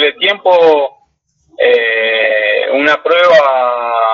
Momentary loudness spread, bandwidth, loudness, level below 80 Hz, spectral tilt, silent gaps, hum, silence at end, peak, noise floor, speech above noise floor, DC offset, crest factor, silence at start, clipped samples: 6 LU; 7 kHz; -10 LUFS; -62 dBFS; -3.5 dB/octave; none; none; 0 s; 0 dBFS; -58 dBFS; 48 dB; under 0.1%; 10 dB; 0 s; under 0.1%